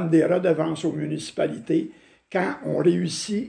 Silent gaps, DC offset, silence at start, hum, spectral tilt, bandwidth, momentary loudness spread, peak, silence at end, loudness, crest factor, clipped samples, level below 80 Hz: none; under 0.1%; 0 s; none; -6 dB/octave; 10 kHz; 9 LU; -8 dBFS; 0 s; -24 LUFS; 16 dB; under 0.1%; -66 dBFS